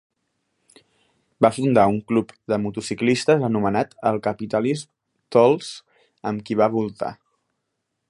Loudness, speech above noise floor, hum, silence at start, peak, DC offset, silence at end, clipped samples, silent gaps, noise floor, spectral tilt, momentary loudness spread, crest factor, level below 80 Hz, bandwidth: -21 LUFS; 57 dB; none; 1.4 s; 0 dBFS; under 0.1%; 0.95 s; under 0.1%; none; -77 dBFS; -6 dB/octave; 12 LU; 22 dB; -58 dBFS; 11.5 kHz